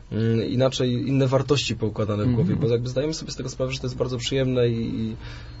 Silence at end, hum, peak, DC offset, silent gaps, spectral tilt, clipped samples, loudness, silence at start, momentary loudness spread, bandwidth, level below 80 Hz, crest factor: 0 s; none; -8 dBFS; under 0.1%; none; -6 dB/octave; under 0.1%; -24 LUFS; 0.05 s; 8 LU; 8 kHz; -44 dBFS; 16 dB